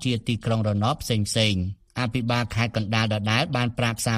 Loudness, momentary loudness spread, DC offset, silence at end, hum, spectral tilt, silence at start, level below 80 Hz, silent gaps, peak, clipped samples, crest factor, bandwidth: -24 LUFS; 5 LU; 0.1%; 0 s; none; -5 dB/octave; 0 s; -48 dBFS; none; -4 dBFS; under 0.1%; 20 dB; 15.5 kHz